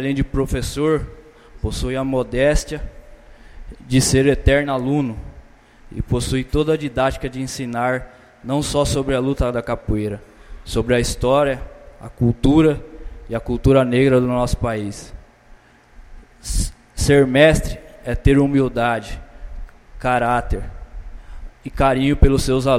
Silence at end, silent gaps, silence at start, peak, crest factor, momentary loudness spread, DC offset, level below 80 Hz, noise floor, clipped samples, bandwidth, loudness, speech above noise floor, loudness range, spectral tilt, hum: 0 s; none; 0 s; 0 dBFS; 18 dB; 21 LU; under 0.1%; -28 dBFS; -47 dBFS; under 0.1%; 16 kHz; -19 LUFS; 30 dB; 5 LU; -5.5 dB/octave; none